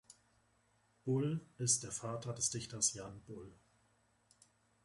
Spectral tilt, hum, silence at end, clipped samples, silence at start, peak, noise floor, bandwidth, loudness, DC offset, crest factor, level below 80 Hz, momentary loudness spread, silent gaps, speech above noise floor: -3.5 dB/octave; none; 1.3 s; under 0.1%; 0.1 s; -18 dBFS; -75 dBFS; 11.5 kHz; -37 LUFS; under 0.1%; 24 dB; -72 dBFS; 18 LU; none; 36 dB